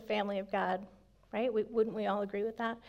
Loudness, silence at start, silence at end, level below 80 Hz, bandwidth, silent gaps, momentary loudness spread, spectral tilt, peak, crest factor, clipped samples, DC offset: -35 LUFS; 0 s; 0 s; -68 dBFS; 7.2 kHz; none; 6 LU; -7 dB/octave; -20 dBFS; 16 dB; under 0.1%; under 0.1%